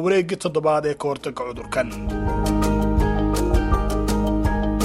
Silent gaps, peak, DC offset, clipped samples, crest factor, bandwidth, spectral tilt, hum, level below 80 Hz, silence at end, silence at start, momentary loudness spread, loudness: none; -6 dBFS; under 0.1%; under 0.1%; 14 dB; 15.5 kHz; -6.5 dB/octave; none; -26 dBFS; 0 s; 0 s; 6 LU; -22 LUFS